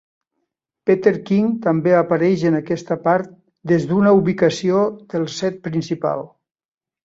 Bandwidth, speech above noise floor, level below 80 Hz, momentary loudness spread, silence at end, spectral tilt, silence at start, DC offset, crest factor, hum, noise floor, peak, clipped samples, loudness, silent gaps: 7.8 kHz; 59 dB; -60 dBFS; 10 LU; 0.8 s; -7 dB/octave; 0.85 s; under 0.1%; 16 dB; none; -76 dBFS; -2 dBFS; under 0.1%; -18 LUFS; none